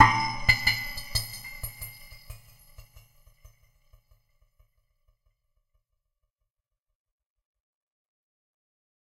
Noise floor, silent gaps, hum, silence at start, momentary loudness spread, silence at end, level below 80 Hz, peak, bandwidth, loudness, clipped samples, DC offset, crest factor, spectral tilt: -84 dBFS; none; none; 0 s; 26 LU; 6 s; -46 dBFS; -2 dBFS; 16 kHz; -26 LUFS; under 0.1%; under 0.1%; 30 dB; -2.5 dB/octave